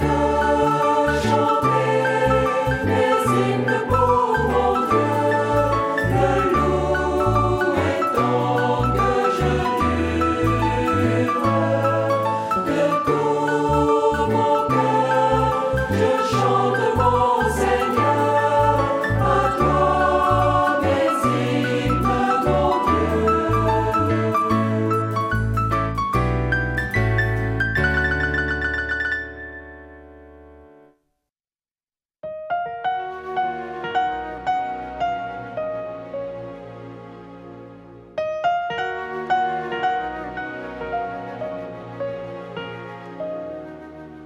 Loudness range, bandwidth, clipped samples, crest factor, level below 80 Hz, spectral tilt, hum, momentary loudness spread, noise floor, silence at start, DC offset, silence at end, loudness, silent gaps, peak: 11 LU; 16.5 kHz; under 0.1%; 16 dB; -36 dBFS; -6.5 dB/octave; none; 13 LU; under -90 dBFS; 0 s; under 0.1%; 0 s; -20 LUFS; none; -4 dBFS